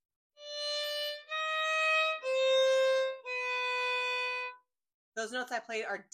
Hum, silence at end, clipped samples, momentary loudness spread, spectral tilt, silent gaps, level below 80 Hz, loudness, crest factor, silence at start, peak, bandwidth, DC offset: none; 0.1 s; under 0.1%; 11 LU; 0.5 dB/octave; 4.94-5.12 s; under -90 dBFS; -31 LUFS; 14 dB; 0.4 s; -20 dBFS; 15 kHz; under 0.1%